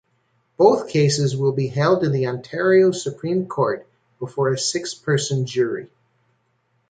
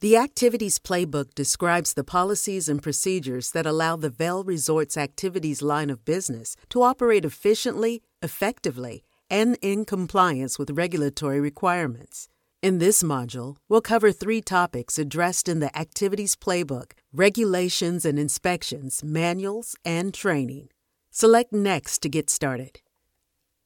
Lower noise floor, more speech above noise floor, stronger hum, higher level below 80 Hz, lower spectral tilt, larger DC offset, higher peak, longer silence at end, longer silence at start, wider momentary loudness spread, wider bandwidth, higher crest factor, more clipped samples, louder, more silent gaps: second, -67 dBFS vs -76 dBFS; second, 48 dB vs 52 dB; neither; about the same, -62 dBFS vs -58 dBFS; first, -5.5 dB/octave vs -4 dB/octave; neither; about the same, -2 dBFS vs -2 dBFS; about the same, 1.05 s vs 0.95 s; first, 0.6 s vs 0 s; about the same, 10 LU vs 10 LU; second, 9.4 kHz vs 17.5 kHz; about the same, 18 dB vs 22 dB; neither; first, -20 LUFS vs -24 LUFS; neither